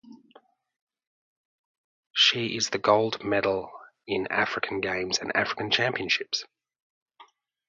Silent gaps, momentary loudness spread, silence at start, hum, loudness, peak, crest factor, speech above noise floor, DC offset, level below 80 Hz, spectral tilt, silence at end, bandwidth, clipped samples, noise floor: 0.82-0.87 s, 1.07-2.10 s, 6.82-7.06 s; 11 LU; 0.1 s; none; -25 LUFS; -6 dBFS; 24 dB; 33 dB; under 0.1%; -64 dBFS; -2.5 dB/octave; 0.45 s; 7.8 kHz; under 0.1%; -59 dBFS